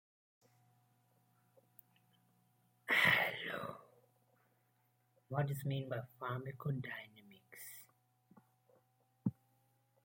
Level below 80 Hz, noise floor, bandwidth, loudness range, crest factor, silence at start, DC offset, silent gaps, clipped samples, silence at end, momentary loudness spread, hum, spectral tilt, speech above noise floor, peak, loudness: -82 dBFS; -77 dBFS; 16.5 kHz; 11 LU; 26 dB; 2.85 s; under 0.1%; none; under 0.1%; 0.75 s; 22 LU; none; -5 dB/octave; 36 dB; -18 dBFS; -38 LUFS